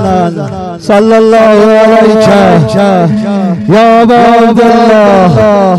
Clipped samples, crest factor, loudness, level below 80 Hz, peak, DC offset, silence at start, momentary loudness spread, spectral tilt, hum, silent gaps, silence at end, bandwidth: 10%; 4 dB; -5 LUFS; -36 dBFS; 0 dBFS; 0.7%; 0 s; 7 LU; -7 dB/octave; none; none; 0 s; 12 kHz